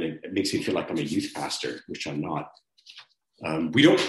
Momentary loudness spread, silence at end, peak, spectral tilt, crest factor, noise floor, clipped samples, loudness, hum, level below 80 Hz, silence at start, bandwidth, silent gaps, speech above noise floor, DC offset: 22 LU; 0 s; -6 dBFS; -4.5 dB/octave; 22 dB; -53 dBFS; under 0.1%; -27 LUFS; none; -64 dBFS; 0 s; 12.5 kHz; none; 27 dB; under 0.1%